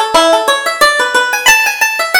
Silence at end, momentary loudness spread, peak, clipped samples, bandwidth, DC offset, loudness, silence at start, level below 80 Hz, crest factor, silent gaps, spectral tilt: 0 s; 4 LU; 0 dBFS; 0.3%; over 20 kHz; under 0.1%; -9 LUFS; 0 s; -44 dBFS; 10 dB; none; 0.5 dB/octave